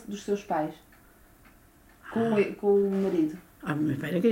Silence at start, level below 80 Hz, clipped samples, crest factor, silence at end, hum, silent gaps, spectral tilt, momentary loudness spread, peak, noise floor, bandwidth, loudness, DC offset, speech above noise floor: 0 s; -62 dBFS; under 0.1%; 16 dB; 0 s; none; none; -7.5 dB/octave; 10 LU; -12 dBFS; -57 dBFS; 16 kHz; -28 LUFS; under 0.1%; 30 dB